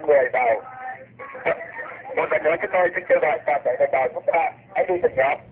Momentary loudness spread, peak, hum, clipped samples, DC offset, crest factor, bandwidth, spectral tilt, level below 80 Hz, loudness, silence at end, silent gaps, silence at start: 14 LU; -6 dBFS; none; under 0.1%; under 0.1%; 16 dB; 4 kHz; -8.5 dB/octave; -60 dBFS; -22 LUFS; 0.1 s; none; 0 s